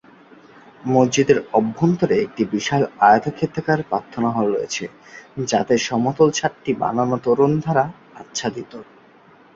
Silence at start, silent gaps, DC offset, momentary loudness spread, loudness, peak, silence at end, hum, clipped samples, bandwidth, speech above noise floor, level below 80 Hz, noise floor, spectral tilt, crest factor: 0.85 s; none; under 0.1%; 12 LU; -19 LUFS; -2 dBFS; 0.7 s; none; under 0.1%; 8 kHz; 30 dB; -56 dBFS; -50 dBFS; -5.5 dB/octave; 18 dB